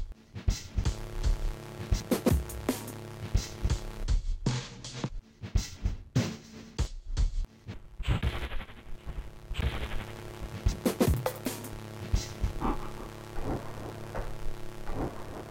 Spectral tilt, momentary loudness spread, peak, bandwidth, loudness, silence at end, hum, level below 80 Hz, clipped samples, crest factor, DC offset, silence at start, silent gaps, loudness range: -5.5 dB/octave; 13 LU; -12 dBFS; 16.5 kHz; -35 LUFS; 0 s; none; -36 dBFS; under 0.1%; 20 dB; under 0.1%; 0 s; none; 4 LU